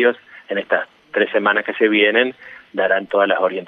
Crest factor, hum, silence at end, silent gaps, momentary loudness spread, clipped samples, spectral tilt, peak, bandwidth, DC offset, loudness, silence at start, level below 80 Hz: 16 dB; none; 0 s; none; 11 LU; under 0.1%; -6.5 dB/octave; -2 dBFS; 4.7 kHz; under 0.1%; -18 LUFS; 0 s; -70 dBFS